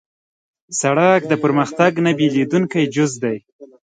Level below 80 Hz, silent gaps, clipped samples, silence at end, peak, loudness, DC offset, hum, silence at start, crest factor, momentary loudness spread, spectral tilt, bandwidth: -64 dBFS; 3.52-3.59 s; under 0.1%; 0.35 s; 0 dBFS; -17 LUFS; under 0.1%; none; 0.7 s; 18 dB; 9 LU; -5.5 dB/octave; 9.6 kHz